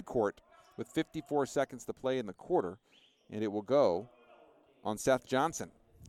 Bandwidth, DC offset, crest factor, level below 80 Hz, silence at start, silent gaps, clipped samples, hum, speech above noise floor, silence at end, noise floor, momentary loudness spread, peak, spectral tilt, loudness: 15 kHz; under 0.1%; 20 dB; -66 dBFS; 0 s; none; under 0.1%; none; 29 dB; 0 s; -63 dBFS; 16 LU; -16 dBFS; -5 dB/octave; -34 LUFS